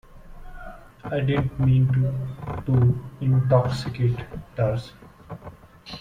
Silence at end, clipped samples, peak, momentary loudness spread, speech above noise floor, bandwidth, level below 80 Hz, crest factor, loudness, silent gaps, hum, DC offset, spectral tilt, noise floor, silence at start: 0 s; under 0.1%; -6 dBFS; 23 LU; 22 dB; 7.4 kHz; -44 dBFS; 18 dB; -23 LUFS; none; none; under 0.1%; -8.5 dB/octave; -44 dBFS; 0.15 s